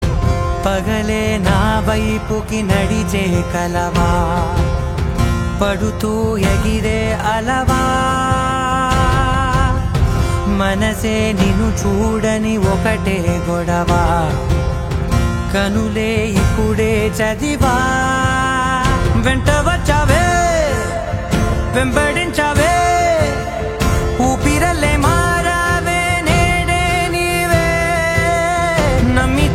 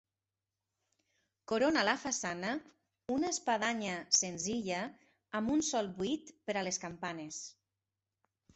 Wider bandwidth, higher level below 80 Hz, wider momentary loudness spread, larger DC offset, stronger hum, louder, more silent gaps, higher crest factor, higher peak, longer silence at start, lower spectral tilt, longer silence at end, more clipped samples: first, 16.5 kHz vs 8.2 kHz; first, -22 dBFS vs -72 dBFS; second, 4 LU vs 13 LU; neither; neither; first, -15 LUFS vs -35 LUFS; neither; second, 14 dB vs 22 dB; first, 0 dBFS vs -16 dBFS; second, 0 s vs 1.5 s; first, -5.5 dB/octave vs -2.5 dB/octave; second, 0 s vs 1.05 s; neither